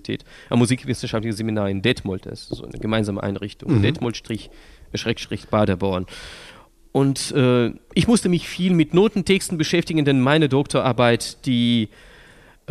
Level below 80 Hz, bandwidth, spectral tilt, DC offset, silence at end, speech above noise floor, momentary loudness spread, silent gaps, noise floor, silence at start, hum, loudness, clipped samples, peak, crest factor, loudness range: -46 dBFS; 14 kHz; -5.5 dB/octave; under 0.1%; 0.85 s; 28 dB; 14 LU; none; -49 dBFS; 0.05 s; none; -21 LUFS; under 0.1%; -4 dBFS; 18 dB; 6 LU